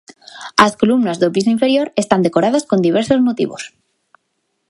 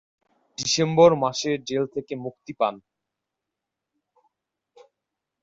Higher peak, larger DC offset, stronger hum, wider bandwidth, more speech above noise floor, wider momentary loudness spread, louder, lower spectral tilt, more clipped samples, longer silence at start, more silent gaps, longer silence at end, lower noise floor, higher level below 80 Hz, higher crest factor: first, 0 dBFS vs -4 dBFS; neither; neither; first, 11.5 kHz vs 7.8 kHz; second, 55 dB vs 62 dB; second, 9 LU vs 17 LU; first, -15 LUFS vs -23 LUFS; about the same, -5 dB/octave vs -4.5 dB/octave; neither; second, 0.35 s vs 0.6 s; neither; second, 1.05 s vs 2.65 s; second, -70 dBFS vs -85 dBFS; first, -54 dBFS vs -64 dBFS; second, 16 dB vs 22 dB